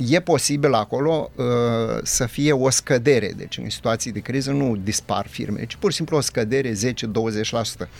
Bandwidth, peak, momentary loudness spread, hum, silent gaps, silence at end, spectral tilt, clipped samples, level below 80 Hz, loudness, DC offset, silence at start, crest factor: 17 kHz; -4 dBFS; 7 LU; none; none; 0 s; -4.5 dB/octave; under 0.1%; -48 dBFS; -21 LUFS; under 0.1%; 0 s; 18 dB